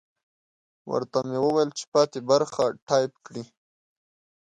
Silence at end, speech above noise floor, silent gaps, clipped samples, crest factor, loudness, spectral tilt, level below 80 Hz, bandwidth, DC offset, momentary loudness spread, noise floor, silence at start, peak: 1 s; over 65 dB; 1.87-1.92 s, 2.82-2.87 s; under 0.1%; 18 dB; -25 LUFS; -5 dB/octave; -70 dBFS; 10.5 kHz; under 0.1%; 12 LU; under -90 dBFS; 0.85 s; -8 dBFS